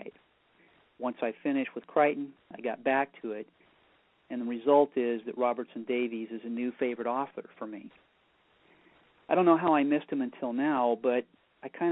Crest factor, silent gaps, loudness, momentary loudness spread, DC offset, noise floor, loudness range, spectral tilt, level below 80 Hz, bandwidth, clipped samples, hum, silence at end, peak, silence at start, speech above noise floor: 22 dB; none; -30 LUFS; 18 LU; under 0.1%; -68 dBFS; 6 LU; -9.5 dB/octave; -80 dBFS; 4 kHz; under 0.1%; none; 0 s; -10 dBFS; 0 s; 39 dB